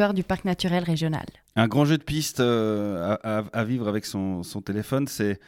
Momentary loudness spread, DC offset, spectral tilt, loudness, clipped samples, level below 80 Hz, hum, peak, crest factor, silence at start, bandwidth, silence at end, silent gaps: 8 LU; under 0.1%; -6 dB/octave; -26 LUFS; under 0.1%; -52 dBFS; none; -8 dBFS; 18 dB; 0 s; 16.5 kHz; 0.1 s; none